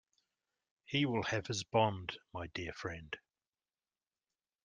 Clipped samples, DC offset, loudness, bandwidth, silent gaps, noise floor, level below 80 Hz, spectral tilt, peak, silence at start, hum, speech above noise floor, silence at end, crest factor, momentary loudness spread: under 0.1%; under 0.1%; -37 LUFS; 10 kHz; none; under -90 dBFS; -68 dBFS; -4.5 dB/octave; -16 dBFS; 0.9 s; none; over 53 dB; 1.5 s; 24 dB; 13 LU